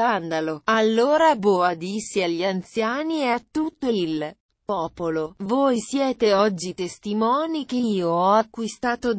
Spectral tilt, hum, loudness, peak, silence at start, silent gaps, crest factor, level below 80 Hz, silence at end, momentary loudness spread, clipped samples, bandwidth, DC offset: -5 dB/octave; none; -23 LUFS; -6 dBFS; 0 s; 4.40-4.49 s; 16 dB; -60 dBFS; 0 s; 9 LU; under 0.1%; 8 kHz; under 0.1%